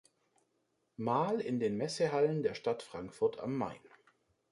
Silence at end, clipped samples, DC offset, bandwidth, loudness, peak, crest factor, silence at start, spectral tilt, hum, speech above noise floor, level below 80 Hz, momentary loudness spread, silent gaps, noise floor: 0.65 s; under 0.1%; under 0.1%; 11.5 kHz; -35 LUFS; -18 dBFS; 18 dB; 1 s; -6 dB/octave; none; 45 dB; -72 dBFS; 10 LU; none; -79 dBFS